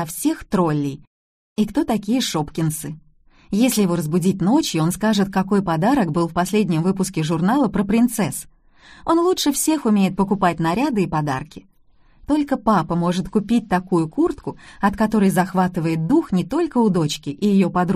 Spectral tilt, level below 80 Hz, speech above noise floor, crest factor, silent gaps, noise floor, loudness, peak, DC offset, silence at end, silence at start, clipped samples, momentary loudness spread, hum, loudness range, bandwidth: -5.5 dB/octave; -46 dBFS; 34 dB; 14 dB; 1.07-1.56 s; -53 dBFS; -20 LUFS; -4 dBFS; under 0.1%; 0 s; 0 s; under 0.1%; 6 LU; none; 3 LU; 15.5 kHz